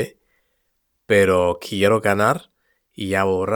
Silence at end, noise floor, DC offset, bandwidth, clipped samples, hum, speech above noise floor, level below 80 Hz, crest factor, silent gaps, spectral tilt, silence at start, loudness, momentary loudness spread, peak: 0 s; -71 dBFS; under 0.1%; 19.5 kHz; under 0.1%; none; 53 dB; -56 dBFS; 18 dB; none; -5.5 dB/octave; 0 s; -19 LUFS; 11 LU; -2 dBFS